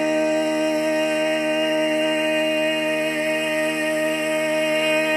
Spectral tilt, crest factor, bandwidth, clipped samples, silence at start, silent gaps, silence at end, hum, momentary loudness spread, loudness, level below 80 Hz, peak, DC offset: -3 dB/octave; 10 dB; 15.5 kHz; under 0.1%; 0 s; none; 0 s; none; 2 LU; -21 LUFS; -70 dBFS; -10 dBFS; under 0.1%